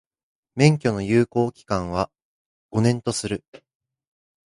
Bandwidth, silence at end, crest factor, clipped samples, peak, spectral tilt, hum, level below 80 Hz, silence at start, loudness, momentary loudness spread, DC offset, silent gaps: 11.5 kHz; 1.1 s; 22 dB; under 0.1%; -2 dBFS; -6 dB/octave; none; -50 dBFS; 0.55 s; -23 LUFS; 12 LU; under 0.1%; 2.22-2.69 s